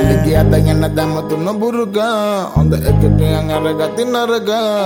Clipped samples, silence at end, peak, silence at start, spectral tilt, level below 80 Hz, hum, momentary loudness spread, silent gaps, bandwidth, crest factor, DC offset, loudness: under 0.1%; 0 s; 0 dBFS; 0 s; -7 dB/octave; -24 dBFS; none; 5 LU; none; 17 kHz; 12 dB; under 0.1%; -14 LUFS